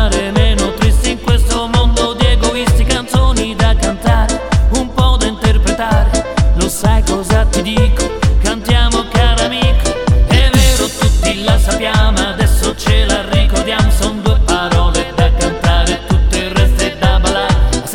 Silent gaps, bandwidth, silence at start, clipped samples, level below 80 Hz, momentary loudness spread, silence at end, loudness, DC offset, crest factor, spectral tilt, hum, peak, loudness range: none; 15.5 kHz; 0 s; under 0.1%; -14 dBFS; 2 LU; 0 s; -13 LUFS; under 0.1%; 10 dB; -4.5 dB/octave; none; 0 dBFS; 1 LU